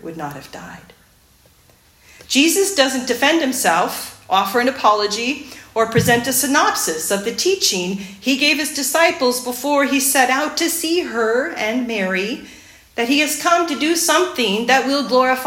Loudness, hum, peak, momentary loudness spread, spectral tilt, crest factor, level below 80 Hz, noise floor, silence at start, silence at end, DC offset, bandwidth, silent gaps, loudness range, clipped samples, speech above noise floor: -17 LUFS; none; 0 dBFS; 10 LU; -2.5 dB/octave; 18 dB; -56 dBFS; -52 dBFS; 0.05 s; 0 s; under 0.1%; 16.5 kHz; none; 2 LU; under 0.1%; 35 dB